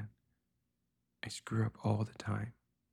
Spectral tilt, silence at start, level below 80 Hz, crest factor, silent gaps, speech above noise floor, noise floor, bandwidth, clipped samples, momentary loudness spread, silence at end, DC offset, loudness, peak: -6.5 dB/octave; 0 s; -68 dBFS; 18 dB; none; 47 dB; -84 dBFS; 11.5 kHz; under 0.1%; 13 LU; 0.4 s; under 0.1%; -39 LUFS; -22 dBFS